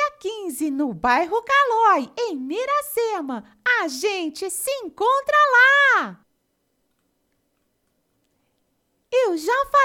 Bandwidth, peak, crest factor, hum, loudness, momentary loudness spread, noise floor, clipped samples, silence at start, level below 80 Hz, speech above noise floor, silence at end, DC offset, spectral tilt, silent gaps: 18 kHz; -6 dBFS; 16 dB; none; -20 LUFS; 13 LU; -71 dBFS; under 0.1%; 0 s; -60 dBFS; 51 dB; 0 s; under 0.1%; -2 dB/octave; none